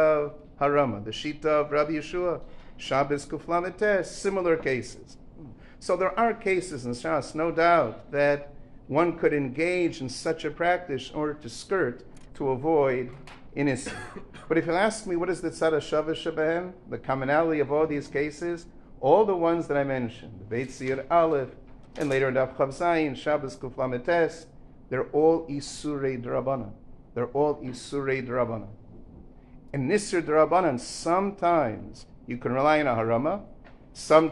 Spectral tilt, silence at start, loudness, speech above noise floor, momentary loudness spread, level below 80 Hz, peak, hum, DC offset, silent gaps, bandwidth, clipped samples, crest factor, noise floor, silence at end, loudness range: -5.5 dB/octave; 0 s; -26 LUFS; 22 dB; 14 LU; -52 dBFS; -4 dBFS; none; under 0.1%; none; 11.5 kHz; under 0.1%; 22 dB; -48 dBFS; 0 s; 3 LU